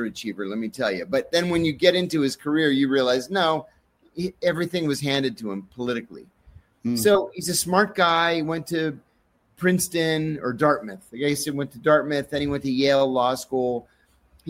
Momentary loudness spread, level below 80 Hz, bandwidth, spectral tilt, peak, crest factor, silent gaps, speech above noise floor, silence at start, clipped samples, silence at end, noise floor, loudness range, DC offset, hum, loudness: 10 LU; -56 dBFS; 16.5 kHz; -4.5 dB/octave; -2 dBFS; 22 dB; none; 42 dB; 0 s; under 0.1%; 0 s; -65 dBFS; 3 LU; under 0.1%; none; -23 LUFS